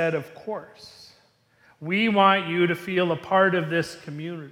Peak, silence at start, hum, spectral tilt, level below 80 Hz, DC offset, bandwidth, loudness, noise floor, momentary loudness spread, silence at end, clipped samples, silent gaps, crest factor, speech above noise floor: -4 dBFS; 0 s; none; -6 dB/octave; -68 dBFS; under 0.1%; 16 kHz; -23 LUFS; -61 dBFS; 16 LU; 0 s; under 0.1%; none; 20 dB; 37 dB